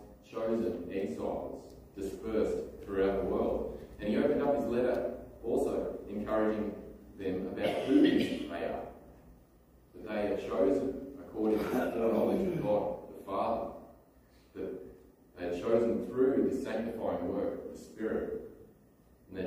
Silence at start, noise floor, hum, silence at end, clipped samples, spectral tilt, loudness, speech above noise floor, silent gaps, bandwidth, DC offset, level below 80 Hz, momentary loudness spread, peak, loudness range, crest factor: 0 s; -62 dBFS; none; 0 s; under 0.1%; -7 dB/octave; -33 LUFS; 30 dB; none; 15.5 kHz; under 0.1%; -56 dBFS; 14 LU; -14 dBFS; 4 LU; 20 dB